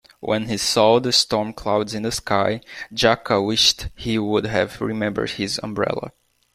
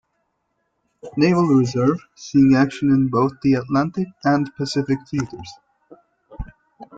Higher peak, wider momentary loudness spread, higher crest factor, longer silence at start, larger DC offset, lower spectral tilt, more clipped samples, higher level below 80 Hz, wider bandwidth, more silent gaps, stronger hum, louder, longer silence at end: about the same, -2 dBFS vs -4 dBFS; second, 9 LU vs 22 LU; about the same, 20 dB vs 16 dB; second, 0.2 s vs 1.05 s; neither; second, -3.5 dB/octave vs -7 dB/octave; neither; about the same, -46 dBFS vs -46 dBFS; first, 16 kHz vs 7.8 kHz; neither; neither; about the same, -20 LUFS vs -19 LUFS; first, 0.45 s vs 0 s